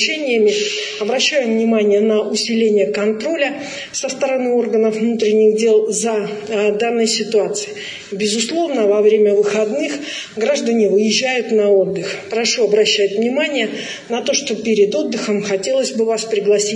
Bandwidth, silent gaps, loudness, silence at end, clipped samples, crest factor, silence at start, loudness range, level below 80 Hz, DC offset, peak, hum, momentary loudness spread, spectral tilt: 10 kHz; none; -16 LUFS; 0 s; under 0.1%; 14 dB; 0 s; 2 LU; -68 dBFS; under 0.1%; -2 dBFS; none; 8 LU; -3 dB/octave